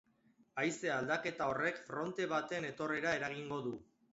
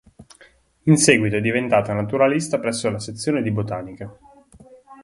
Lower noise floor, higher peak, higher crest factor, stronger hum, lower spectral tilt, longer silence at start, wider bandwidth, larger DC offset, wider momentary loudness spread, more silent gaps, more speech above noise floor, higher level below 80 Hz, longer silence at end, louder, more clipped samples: first, -71 dBFS vs -54 dBFS; second, -20 dBFS vs 0 dBFS; about the same, 20 dB vs 22 dB; neither; second, -3.5 dB/octave vs -5 dB/octave; first, 0.55 s vs 0.2 s; second, 7.6 kHz vs 11.5 kHz; neither; second, 6 LU vs 14 LU; neither; about the same, 33 dB vs 34 dB; second, -74 dBFS vs -54 dBFS; first, 0.3 s vs 0.1 s; second, -38 LUFS vs -20 LUFS; neither